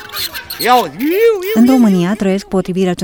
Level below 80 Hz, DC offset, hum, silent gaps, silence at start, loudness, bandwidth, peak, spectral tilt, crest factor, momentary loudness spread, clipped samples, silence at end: -46 dBFS; 0.2%; none; none; 0 s; -13 LUFS; over 20 kHz; 0 dBFS; -5.5 dB/octave; 12 dB; 9 LU; under 0.1%; 0 s